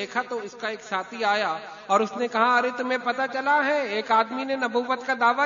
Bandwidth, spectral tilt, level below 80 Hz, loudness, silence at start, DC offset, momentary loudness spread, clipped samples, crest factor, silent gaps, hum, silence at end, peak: 7.4 kHz; -3.5 dB/octave; -74 dBFS; -24 LUFS; 0 s; under 0.1%; 9 LU; under 0.1%; 18 dB; none; none; 0 s; -6 dBFS